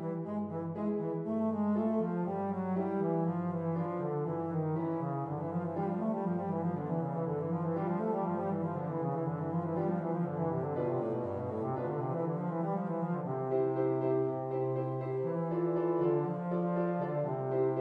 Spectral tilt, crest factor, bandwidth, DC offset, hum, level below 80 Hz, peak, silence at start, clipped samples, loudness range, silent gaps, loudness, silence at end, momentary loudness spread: -11.5 dB/octave; 14 dB; 3.8 kHz; under 0.1%; none; -76 dBFS; -20 dBFS; 0 s; under 0.1%; 2 LU; none; -34 LUFS; 0 s; 4 LU